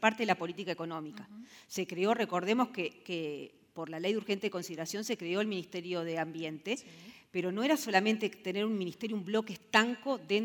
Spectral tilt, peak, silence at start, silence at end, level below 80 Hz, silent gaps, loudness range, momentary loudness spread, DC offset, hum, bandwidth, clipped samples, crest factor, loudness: -4.5 dB/octave; -10 dBFS; 0 s; 0 s; -84 dBFS; none; 4 LU; 14 LU; under 0.1%; none; 19 kHz; under 0.1%; 24 dB; -34 LUFS